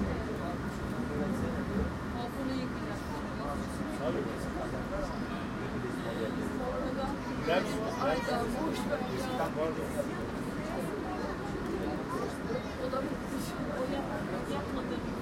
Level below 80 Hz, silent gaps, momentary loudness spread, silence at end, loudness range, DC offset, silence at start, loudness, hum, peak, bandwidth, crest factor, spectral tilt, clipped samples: -48 dBFS; none; 5 LU; 0 s; 3 LU; under 0.1%; 0 s; -35 LUFS; none; -16 dBFS; 16.5 kHz; 18 dB; -6 dB/octave; under 0.1%